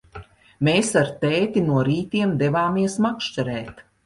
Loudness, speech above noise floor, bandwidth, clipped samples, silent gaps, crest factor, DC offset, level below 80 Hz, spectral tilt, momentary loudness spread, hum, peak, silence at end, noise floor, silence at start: -21 LUFS; 22 dB; 11.5 kHz; under 0.1%; none; 16 dB; under 0.1%; -52 dBFS; -5.5 dB/octave; 7 LU; none; -6 dBFS; 0.25 s; -43 dBFS; 0.15 s